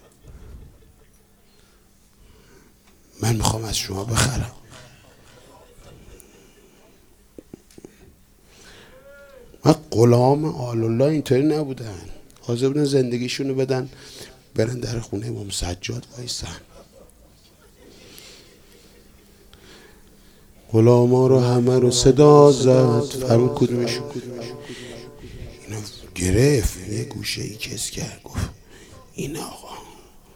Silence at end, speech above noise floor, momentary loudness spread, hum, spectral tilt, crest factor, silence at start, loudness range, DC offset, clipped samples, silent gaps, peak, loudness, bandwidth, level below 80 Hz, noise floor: 0.45 s; 35 dB; 22 LU; none; -6 dB/octave; 22 dB; 0.3 s; 15 LU; under 0.1%; under 0.1%; none; 0 dBFS; -20 LUFS; 18 kHz; -42 dBFS; -54 dBFS